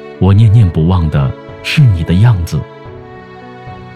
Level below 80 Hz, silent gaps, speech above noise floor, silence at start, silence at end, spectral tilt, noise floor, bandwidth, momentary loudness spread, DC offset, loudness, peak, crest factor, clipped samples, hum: -28 dBFS; none; 22 dB; 0 s; 0 s; -7.5 dB/octave; -31 dBFS; 12 kHz; 23 LU; under 0.1%; -11 LUFS; 0 dBFS; 10 dB; under 0.1%; none